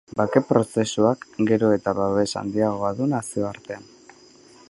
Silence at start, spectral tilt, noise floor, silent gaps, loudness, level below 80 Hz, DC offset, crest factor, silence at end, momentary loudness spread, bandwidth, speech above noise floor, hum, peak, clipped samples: 0.15 s; -6 dB/octave; -50 dBFS; none; -22 LUFS; -56 dBFS; under 0.1%; 20 dB; 0.85 s; 9 LU; 11.5 kHz; 28 dB; none; -2 dBFS; under 0.1%